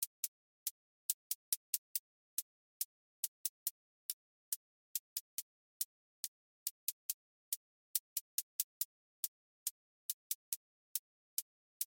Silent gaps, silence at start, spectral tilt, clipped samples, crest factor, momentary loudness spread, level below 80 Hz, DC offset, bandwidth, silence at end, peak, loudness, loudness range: 0.07-7.94 s, 8.00-11.80 s; 0 s; 9 dB/octave; under 0.1%; 28 dB; 8 LU; under -90 dBFS; under 0.1%; 17 kHz; 0.1 s; -18 dBFS; -43 LUFS; 2 LU